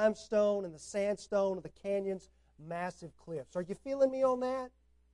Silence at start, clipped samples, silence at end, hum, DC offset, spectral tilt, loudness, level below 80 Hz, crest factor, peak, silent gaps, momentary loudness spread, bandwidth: 0 s; under 0.1%; 0.45 s; none; under 0.1%; -5.5 dB/octave; -35 LUFS; -66 dBFS; 18 dB; -16 dBFS; none; 13 LU; 11 kHz